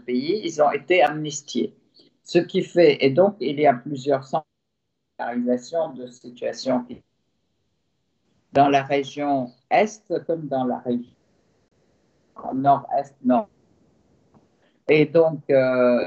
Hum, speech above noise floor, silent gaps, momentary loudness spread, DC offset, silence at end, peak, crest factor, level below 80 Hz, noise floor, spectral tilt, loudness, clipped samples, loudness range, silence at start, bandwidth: none; 57 dB; none; 12 LU; under 0.1%; 0 s; -4 dBFS; 18 dB; -70 dBFS; -78 dBFS; -5.5 dB/octave; -22 LUFS; under 0.1%; 7 LU; 0.1 s; 8.2 kHz